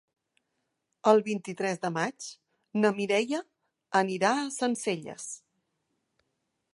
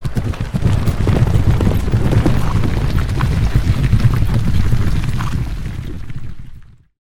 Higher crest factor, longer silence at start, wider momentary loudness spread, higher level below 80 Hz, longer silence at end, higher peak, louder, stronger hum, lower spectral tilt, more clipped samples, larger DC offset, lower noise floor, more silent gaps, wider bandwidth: first, 24 dB vs 14 dB; first, 1.05 s vs 0 s; first, 15 LU vs 12 LU; second, -82 dBFS vs -20 dBFS; first, 1.4 s vs 0.4 s; second, -8 dBFS vs 0 dBFS; second, -28 LUFS vs -17 LUFS; neither; second, -4.5 dB/octave vs -7.5 dB/octave; neither; neither; first, -81 dBFS vs -35 dBFS; neither; second, 11.5 kHz vs 15 kHz